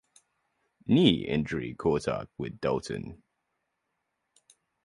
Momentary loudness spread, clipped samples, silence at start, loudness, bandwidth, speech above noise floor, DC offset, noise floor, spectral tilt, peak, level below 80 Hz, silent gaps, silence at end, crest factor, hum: 16 LU; under 0.1%; 0.85 s; -28 LUFS; 11.5 kHz; 53 dB; under 0.1%; -81 dBFS; -6.5 dB/octave; -8 dBFS; -54 dBFS; none; 1.7 s; 24 dB; none